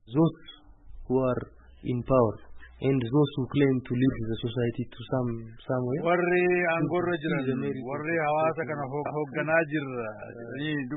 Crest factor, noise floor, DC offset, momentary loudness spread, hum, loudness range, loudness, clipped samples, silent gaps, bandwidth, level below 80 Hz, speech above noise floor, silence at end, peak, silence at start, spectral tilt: 18 dB; -48 dBFS; under 0.1%; 10 LU; none; 2 LU; -28 LUFS; under 0.1%; none; 4 kHz; -52 dBFS; 21 dB; 0 s; -10 dBFS; 0.05 s; -11.5 dB/octave